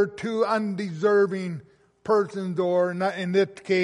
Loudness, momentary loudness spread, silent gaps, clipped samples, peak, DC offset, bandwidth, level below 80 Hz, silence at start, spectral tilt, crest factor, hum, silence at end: -25 LUFS; 9 LU; none; under 0.1%; -10 dBFS; under 0.1%; 11.5 kHz; -70 dBFS; 0 s; -6.5 dB/octave; 14 dB; none; 0 s